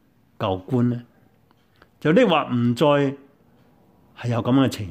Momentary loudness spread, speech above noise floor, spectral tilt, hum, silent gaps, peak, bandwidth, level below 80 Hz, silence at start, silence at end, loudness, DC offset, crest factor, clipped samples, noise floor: 11 LU; 40 dB; -7 dB/octave; none; none; -6 dBFS; 15.5 kHz; -62 dBFS; 0.4 s; 0 s; -21 LUFS; under 0.1%; 18 dB; under 0.1%; -59 dBFS